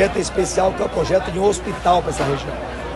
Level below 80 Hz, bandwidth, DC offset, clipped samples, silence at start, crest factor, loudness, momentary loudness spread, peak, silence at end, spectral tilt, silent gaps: -34 dBFS; 12 kHz; under 0.1%; under 0.1%; 0 s; 16 dB; -20 LUFS; 6 LU; -2 dBFS; 0 s; -4.5 dB/octave; none